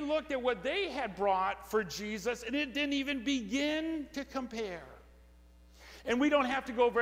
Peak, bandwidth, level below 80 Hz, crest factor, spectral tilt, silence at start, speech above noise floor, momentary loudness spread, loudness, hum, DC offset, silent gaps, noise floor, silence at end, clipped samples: -16 dBFS; 16 kHz; -58 dBFS; 18 dB; -4 dB/octave; 0 s; 26 dB; 9 LU; -33 LUFS; none; under 0.1%; none; -58 dBFS; 0 s; under 0.1%